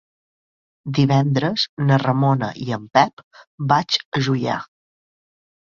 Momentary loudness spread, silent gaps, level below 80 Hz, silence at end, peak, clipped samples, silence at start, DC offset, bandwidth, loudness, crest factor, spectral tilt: 9 LU; 1.69-1.77 s, 3.13-3.17 s, 3.24-3.31 s, 3.47-3.58 s, 4.05-4.12 s; -58 dBFS; 0.95 s; -2 dBFS; under 0.1%; 0.85 s; under 0.1%; 7.2 kHz; -20 LUFS; 20 dB; -6.5 dB/octave